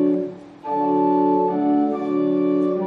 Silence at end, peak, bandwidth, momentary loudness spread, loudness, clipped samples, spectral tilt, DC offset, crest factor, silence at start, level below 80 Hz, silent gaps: 0 s; -8 dBFS; 4.6 kHz; 8 LU; -20 LUFS; under 0.1%; -10 dB/octave; under 0.1%; 10 dB; 0 s; -68 dBFS; none